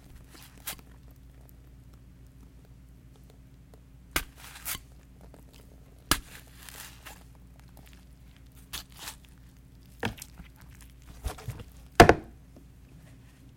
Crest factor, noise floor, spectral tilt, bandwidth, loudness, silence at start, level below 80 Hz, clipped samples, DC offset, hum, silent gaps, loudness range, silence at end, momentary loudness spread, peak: 30 dB; -53 dBFS; -4 dB/octave; 17 kHz; -28 LUFS; 0.65 s; -46 dBFS; under 0.1%; under 0.1%; none; none; 20 LU; 1.3 s; 23 LU; -4 dBFS